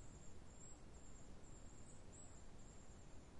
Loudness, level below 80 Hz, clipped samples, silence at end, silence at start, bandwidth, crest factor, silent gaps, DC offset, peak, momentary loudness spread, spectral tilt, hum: -62 LUFS; -64 dBFS; under 0.1%; 0 s; 0 s; 11 kHz; 12 dB; none; under 0.1%; -44 dBFS; 2 LU; -4.5 dB/octave; none